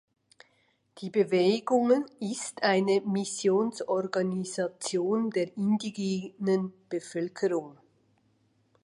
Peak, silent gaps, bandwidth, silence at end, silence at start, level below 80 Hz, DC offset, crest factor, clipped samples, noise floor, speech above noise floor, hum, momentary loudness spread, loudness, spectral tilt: -12 dBFS; none; 11.5 kHz; 1.1 s; 0.95 s; -76 dBFS; under 0.1%; 18 dB; under 0.1%; -70 dBFS; 42 dB; none; 10 LU; -29 LUFS; -5 dB/octave